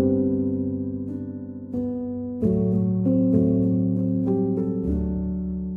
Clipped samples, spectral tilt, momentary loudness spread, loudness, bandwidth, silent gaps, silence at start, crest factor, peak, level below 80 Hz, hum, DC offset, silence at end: under 0.1%; -13.5 dB/octave; 11 LU; -24 LUFS; 1.9 kHz; none; 0 s; 16 dB; -8 dBFS; -40 dBFS; none; under 0.1%; 0 s